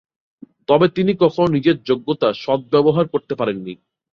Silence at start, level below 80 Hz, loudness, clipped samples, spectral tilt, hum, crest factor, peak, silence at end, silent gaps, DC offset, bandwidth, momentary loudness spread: 0.7 s; -56 dBFS; -18 LUFS; under 0.1%; -8.5 dB/octave; none; 16 dB; -2 dBFS; 0.4 s; none; under 0.1%; 6.8 kHz; 8 LU